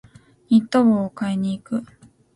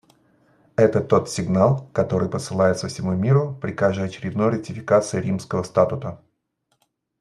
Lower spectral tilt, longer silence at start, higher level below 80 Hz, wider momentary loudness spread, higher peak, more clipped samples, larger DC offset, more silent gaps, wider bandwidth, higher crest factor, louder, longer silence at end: about the same, -7.5 dB/octave vs -7 dB/octave; second, 0.5 s vs 0.8 s; about the same, -60 dBFS vs -56 dBFS; first, 11 LU vs 8 LU; second, -6 dBFS vs -2 dBFS; neither; neither; neither; about the same, 11.5 kHz vs 12 kHz; about the same, 16 dB vs 20 dB; about the same, -21 LUFS vs -22 LUFS; second, 0.5 s vs 1.05 s